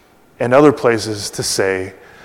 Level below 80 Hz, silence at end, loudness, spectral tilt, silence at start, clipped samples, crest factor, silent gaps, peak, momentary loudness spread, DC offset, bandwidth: -52 dBFS; 0.3 s; -15 LUFS; -4.5 dB/octave; 0.4 s; 0.2%; 16 dB; none; 0 dBFS; 12 LU; under 0.1%; 16.5 kHz